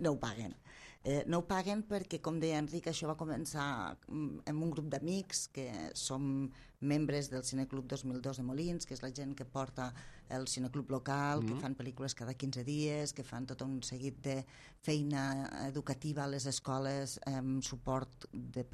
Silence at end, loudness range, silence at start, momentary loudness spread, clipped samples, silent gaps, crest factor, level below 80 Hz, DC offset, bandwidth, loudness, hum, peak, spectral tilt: 0 s; 2 LU; 0 s; 8 LU; under 0.1%; none; 18 dB; -62 dBFS; under 0.1%; 14 kHz; -39 LUFS; none; -20 dBFS; -5 dB/octave